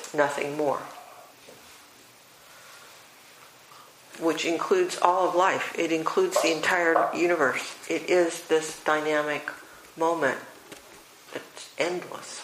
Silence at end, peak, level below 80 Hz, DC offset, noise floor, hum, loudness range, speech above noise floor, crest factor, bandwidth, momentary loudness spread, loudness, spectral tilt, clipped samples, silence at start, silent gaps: 0 s; -2 dBFS; -74 dBFS; under 0.1%; -53 dBFS; none; 10 LU; 27 dB; 26 dB; 15.5 kHz; 23 LU; -25 LUFS; -3 dB/octave; under 0.1%; 0 s; none